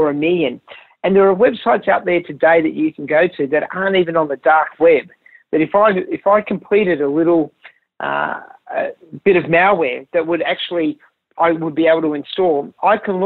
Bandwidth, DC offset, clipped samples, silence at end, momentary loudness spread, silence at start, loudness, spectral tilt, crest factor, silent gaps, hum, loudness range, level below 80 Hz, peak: 4.3 kHz; under 0.1%; under 0.1%; 0 s; 10 LU; 0 s; -16 LUFS; -9.5 dB/octave; 14 dB; none; none; 3 LU; -58 dBFS; -2 dBFS